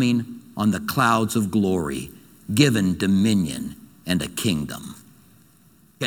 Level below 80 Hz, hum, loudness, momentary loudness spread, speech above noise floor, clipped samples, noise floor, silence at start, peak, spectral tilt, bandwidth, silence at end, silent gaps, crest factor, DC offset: -52 dBFS; none; -22 LUFS; 17 LU; 34 dB; under 0.1%; -55 dBFS; 0 s; -2 dBFS; -5 dB/octave; 19 kHz; 0 s; none; 22 dB; under 0.1%